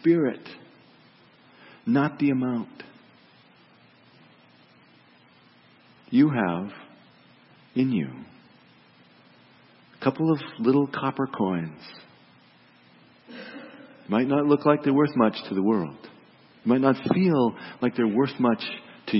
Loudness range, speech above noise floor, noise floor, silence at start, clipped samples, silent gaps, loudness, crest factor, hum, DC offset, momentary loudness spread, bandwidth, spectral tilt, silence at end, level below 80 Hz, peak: 9 LU; 33 dB; -56 dBFS; 0.05 s; under 0.1%; none; -24 LUFS; 22 dB; none; under 0.1%; 21 LU; 5.8 kHz; -11.5 dB/octave; 0 s; -72 dBFS; -6 dBFS